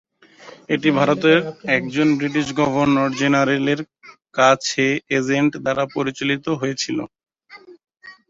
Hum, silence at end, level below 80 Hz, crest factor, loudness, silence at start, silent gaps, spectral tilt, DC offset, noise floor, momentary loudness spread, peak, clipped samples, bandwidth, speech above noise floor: none; 0.15 s; -58 dBFS; 18 dB; -19 LUFS; 0.45 s; none; -5 dB/octave; under 0.1%; -45 dBFS; 9 LU; -2 dBFS; under 0.1%; 7.8 kHz; 26 dB